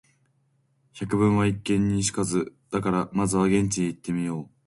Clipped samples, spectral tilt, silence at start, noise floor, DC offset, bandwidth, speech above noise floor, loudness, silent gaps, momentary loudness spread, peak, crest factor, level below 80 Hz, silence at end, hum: under 0.1%; -5.5 dB/octave; 0.95 s; -68 dBFS; under 0.1%; 11.5 kHz; 43 dB; -25 LUFS; none; 7 LU; -10 dBFS; 16 dB; -50 dBFS; 0.2 s; none